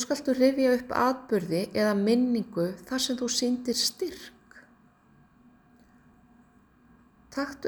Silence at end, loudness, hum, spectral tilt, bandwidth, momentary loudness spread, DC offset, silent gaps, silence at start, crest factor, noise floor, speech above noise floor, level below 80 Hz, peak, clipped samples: 0 s; -27 LUFS; none; -4 dB/octave; over 20 kHz; 11 LU; under 0.1%; none; 0 s; 20 dB; -60 dBFS; 33 dB; -64 dBFS; -10 dBFS; under 0.1%